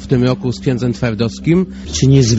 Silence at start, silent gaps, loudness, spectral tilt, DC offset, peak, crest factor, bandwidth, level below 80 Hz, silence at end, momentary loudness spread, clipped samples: 0 s; none; -16 LUFS; -7 dB/octave; under 0.1%; 0 dBFS; 14 dB; 8 kHz; -34 dBFS; 0 s; 6 LU; under 0.1%